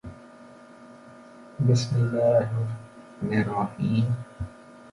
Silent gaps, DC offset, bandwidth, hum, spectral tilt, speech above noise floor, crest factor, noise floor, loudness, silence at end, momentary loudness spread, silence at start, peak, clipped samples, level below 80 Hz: none; under 0.1%; 11 kHz; none; -7.5 dB/octave; 25 dB; 18 dB; -48 dBFS; -25 LUFS; 0 s; 21 LU; 0.05 s; -10 dBFS; under 0.1%; -52 dBFS